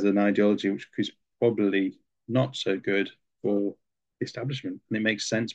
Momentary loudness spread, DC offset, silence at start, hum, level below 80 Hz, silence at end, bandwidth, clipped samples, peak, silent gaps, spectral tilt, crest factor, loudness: 10 LU; under 0.1%; 0 s; none; -72 dBFS; 0 s; 8.8 kHz; under 0.1%; -10 dBFS; none; -5.5 dB/octave; 16 dB; -27 LUFS